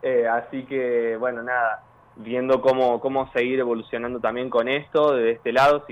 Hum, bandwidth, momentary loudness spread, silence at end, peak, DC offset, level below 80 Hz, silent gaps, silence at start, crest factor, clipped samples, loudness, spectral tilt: none; 10 kHz; 8 LU; 0.05 s; -8 dBFS; under 0.1%; -60 dBFS; none; 0.05 s; 14 dB; under 0.1%; -23 LUFS; -6 dB/octave